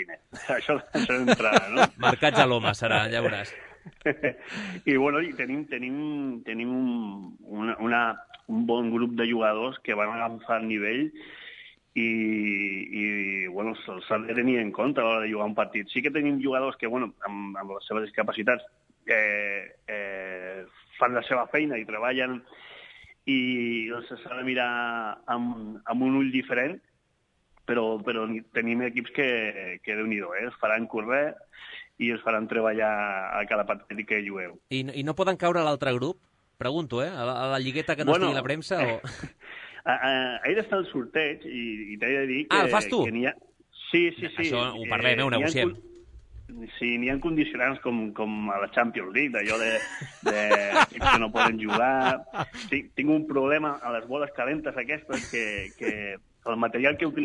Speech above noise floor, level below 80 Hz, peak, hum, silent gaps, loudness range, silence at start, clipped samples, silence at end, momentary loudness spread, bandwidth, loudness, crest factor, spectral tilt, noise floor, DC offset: 44 dB; -56 dBFS; -6 dBFS; none; none; 5 LU; 0 s; under 0.1%; 0 s; 13 LU; 11 kHz; -27 LUFS; 22 dB; -5 dB/octave; -71 dBFS; under 0.1%